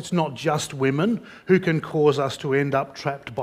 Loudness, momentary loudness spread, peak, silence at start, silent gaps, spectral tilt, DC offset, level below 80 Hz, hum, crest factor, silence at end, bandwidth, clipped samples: -23 LUFS; 9 LU; -6 dBFS; 0 s; none; -6 dB/octave; under 0.1%; -60 dBFS; none; 18 dB; 0 s; 15.5 kHz; under 0.1%